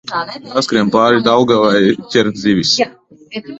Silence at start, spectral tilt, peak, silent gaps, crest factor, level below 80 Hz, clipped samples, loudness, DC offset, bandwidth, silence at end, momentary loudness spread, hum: 0.05 s; -4.5 dB/octave; 0 dBFS; none; 14 dB; -52 dBFS; under 0.1%; -13 LUFS; under 0.1%; 8.2 kHz; 0 s; 11 LU; none